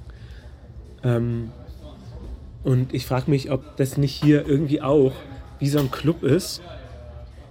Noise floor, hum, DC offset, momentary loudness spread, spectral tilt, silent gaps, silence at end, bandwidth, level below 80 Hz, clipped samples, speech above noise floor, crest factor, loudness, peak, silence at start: -41 dBFS; none; under 0.1%; 23 LU; -7 dB/octave; none; 0 s; 16.5 kHz; -42 dBFS; under 0.1%; 20 dB; 18 dB; -22 LUFS; -6 dBFS; 0 s